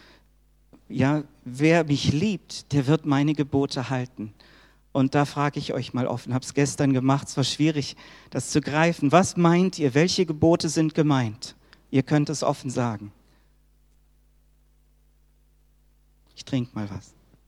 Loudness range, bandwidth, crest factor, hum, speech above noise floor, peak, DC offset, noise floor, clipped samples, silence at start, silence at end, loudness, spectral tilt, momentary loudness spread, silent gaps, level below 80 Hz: 11 LU; 13 kHz; 22 dB; none; 37 dB; -2 dBFS; under 0.1%; -60 dBFS; under 0.1%; 0.9 s; 0.5 s; -24 LUFS; -6 dB/octave; 15 LU; none; -56 dBFS